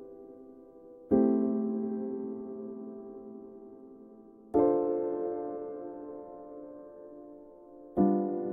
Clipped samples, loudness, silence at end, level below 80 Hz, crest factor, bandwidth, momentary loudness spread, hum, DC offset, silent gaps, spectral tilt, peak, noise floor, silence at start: under 0.1%; -31 LUFS; 0 s; -66 dBFS; 20 dB; 2.4 kHz; 25 LU; none; under 0.1%; none; -12.5 dB/octave; -12 dBFS; -53 dBFS; 0 s